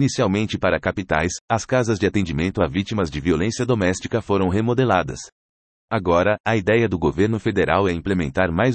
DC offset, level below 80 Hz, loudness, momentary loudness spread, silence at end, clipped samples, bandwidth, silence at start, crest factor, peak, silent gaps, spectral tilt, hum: under 0.1%; -44 dBFS; -21 LUFS; 5 LU; 0 s; under 0.1%; 8.8 kHz; 0 s; 16 dB; -4 dBFS; 1.41-1.48 s, 5.32-5.88 s, 6.40-6.44 s; -6 dB/octave; none